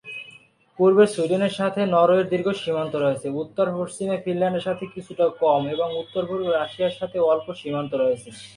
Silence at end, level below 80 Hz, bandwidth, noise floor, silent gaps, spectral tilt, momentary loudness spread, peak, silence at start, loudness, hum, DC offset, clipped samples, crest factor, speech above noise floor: 0.05 s; -64 dBFS; 11 kHz; -51 dBFS; none; -6 dB/octave; 11 LU; -4 dBFS; 0.05 s; -23 LUFS; none; under 0.1%; under 0.1%; 18 dB; 29 dB